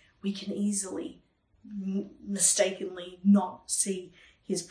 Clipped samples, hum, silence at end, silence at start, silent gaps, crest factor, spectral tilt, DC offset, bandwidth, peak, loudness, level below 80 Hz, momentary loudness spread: under 0.1%; none; 0 s; 0.25 s; none; 20 dB; -4 dB/octave; under 0.1%; 10.5 kHz; -10 dBFS; -29 LUFS; -70 dBFS; 15 LU